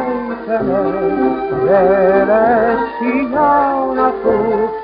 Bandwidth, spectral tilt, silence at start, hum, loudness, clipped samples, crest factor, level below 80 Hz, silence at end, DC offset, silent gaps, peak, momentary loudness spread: 5.2 kHz; -6 dB/octave; 0 s; none; -14 LUFS; under 0.1%; 14 dB; -44 dBFS; 0 s; under 0.1%; none; 0 dBFS; 6 LU